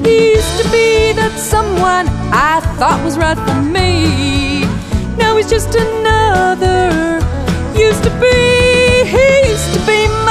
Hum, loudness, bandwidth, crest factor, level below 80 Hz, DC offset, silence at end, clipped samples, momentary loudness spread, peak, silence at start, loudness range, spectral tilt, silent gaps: none; -11 LUFS; 15.5 kHz; 10 dB; -22 dBFS; under 0.1%; 0 s; under 0.1%; 6 LU; 0 dBFS; 0 s; 3 LU; -5 dB/octave; none